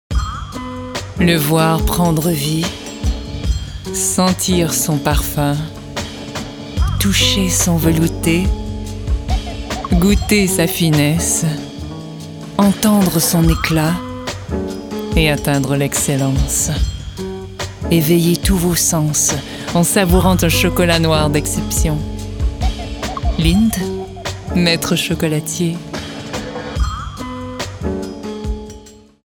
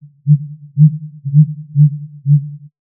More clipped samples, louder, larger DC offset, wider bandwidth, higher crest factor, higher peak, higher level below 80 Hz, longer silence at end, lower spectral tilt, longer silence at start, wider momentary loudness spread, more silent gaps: neither; about the same, -16 LUFS vs -14 LUFS; neither; first, over 20 kHz vs 0.2 kHz; about the same, 16 dB vs 14 dB; about the same, 0 dBFS vs 0 dBFS; first, -26 dBFS vs -76 dBFS; about the same, 0.3 s vs 0.3 s; second, -4.5 dB/octave vs -31 dB/octave; second, 0.1 s vs 0.25 s; about the same, 13 LU vs 12 LU; neither